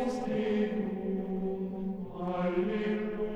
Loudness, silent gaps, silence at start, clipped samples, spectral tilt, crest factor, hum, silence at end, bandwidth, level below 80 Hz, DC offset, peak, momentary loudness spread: -33 LUFS; none; 0 s; under 0.1%; -8 dB/octave; 14 dB; none; 0 s; 9.2 kHz; -54 dBFS; under 0.1%; -18 dBFS; 6 LU